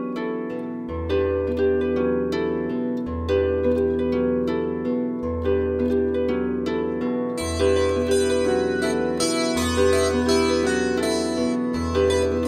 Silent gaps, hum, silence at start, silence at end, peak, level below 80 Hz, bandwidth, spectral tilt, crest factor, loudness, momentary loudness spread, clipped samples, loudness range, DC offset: none; none; 0 s; 0 s; -8 dBFS; -38 dBFS; 15.5 kHz; -5 dB/octave; 14 dB; -23 LUFS; 6 LU; under 0.1%; 3 LU; under 0.1%